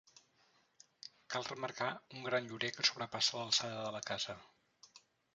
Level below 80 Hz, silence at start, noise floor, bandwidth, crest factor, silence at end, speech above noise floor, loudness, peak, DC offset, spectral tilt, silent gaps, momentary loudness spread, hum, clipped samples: -80 dBFS; 1.05 s; -73 dBFS; 9.6 kHz; 26 dB; 0.35 s; 34 dB; -37 LUFS; -16 dBFS; under 0.1%; -2 dB/octave; none; 15 LU; none; under 0.1%